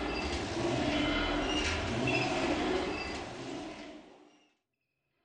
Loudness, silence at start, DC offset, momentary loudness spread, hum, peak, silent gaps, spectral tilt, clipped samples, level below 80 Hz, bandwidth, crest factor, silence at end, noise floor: -33 LUFS; 0 s; under 0.1%; 12 LU; none; -18 dBFS; none; -4.5 dB/octave; under 0.1%; -48 dBFS; 10 kHz; 16 dB; 1 s; -84 dBFS